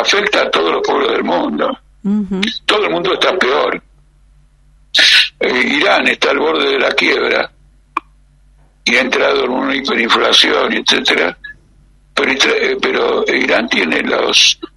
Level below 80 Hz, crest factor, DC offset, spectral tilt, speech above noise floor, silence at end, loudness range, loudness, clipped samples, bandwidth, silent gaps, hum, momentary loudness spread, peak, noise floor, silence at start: -48 dBFS; 14 dB; under 0.1%; -2.5 dB/octave; 35 dB; 0.1 s; 4 LU; -12 LUFS; under 0.1%; 13.5 kHz; none; none; 10 LU; 0 dBFS; -48 dBFS; 0 s